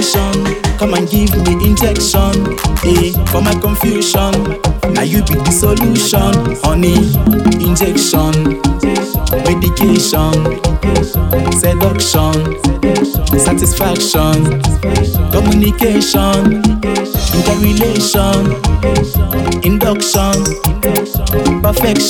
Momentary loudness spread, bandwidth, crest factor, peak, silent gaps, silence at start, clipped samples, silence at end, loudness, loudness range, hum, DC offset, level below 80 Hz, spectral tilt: 4 LU; 19 kHz; 12 dB; 0 dBFS; none; 0 s; under 0.1%; 0 s; -12 LUFS; 1 LU; none; under 0.1%; -18 dBFS; -5 dB/octave